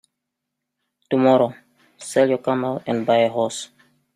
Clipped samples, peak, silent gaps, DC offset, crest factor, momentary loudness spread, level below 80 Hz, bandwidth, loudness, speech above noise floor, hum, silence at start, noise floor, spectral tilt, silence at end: under 0.1%; -4 dBFS; none; under 0.1%; 18 dB; 12 LU; -68 dBFS; 13.5 kHz; -20 LUFS; 62 dB; none; 1.1 s; -81 dBFS; -5.5 dB/octave; 0.5 s